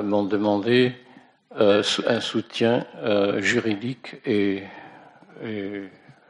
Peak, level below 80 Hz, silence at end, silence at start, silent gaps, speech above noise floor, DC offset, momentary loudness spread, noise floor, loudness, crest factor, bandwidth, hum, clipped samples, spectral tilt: -6 dBFS; -70 dBFS; 0.4 s; 0 s; none; 28 dB; under 0.1%; 17 LU; -50 dBFS; -23 LUFS; 18 dB; 10.5 kHz; none; under 0.1%; -5 dB/octave